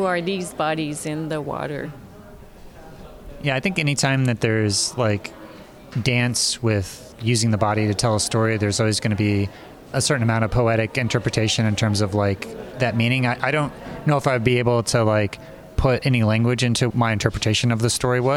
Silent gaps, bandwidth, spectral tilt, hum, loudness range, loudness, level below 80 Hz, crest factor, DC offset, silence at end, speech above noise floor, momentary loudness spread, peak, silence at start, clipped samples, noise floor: none; 15 kHz; -5 dB/octave; none; 4 LU; -21 LUFS; -42 dBFS; 18 dB; under 0.1%; 0 s; 22 dB; 9 LU; -4 dBFS; 0 s; under 0.1%; -42 dBFS